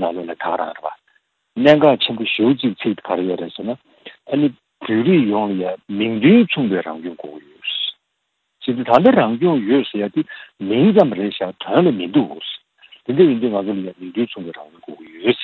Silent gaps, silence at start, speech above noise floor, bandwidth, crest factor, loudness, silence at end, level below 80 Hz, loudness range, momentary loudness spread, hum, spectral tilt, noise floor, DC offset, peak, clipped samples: none; 0 s; 56 dB; 6.2 kHz; 18 dB; -17 LUFS; 0 s; -62 dBFS; 4 LU; 18 LU; none; -8.5 dB/octave; -73 dBFS; under 0.1%; 0 dBFS; under 0.1%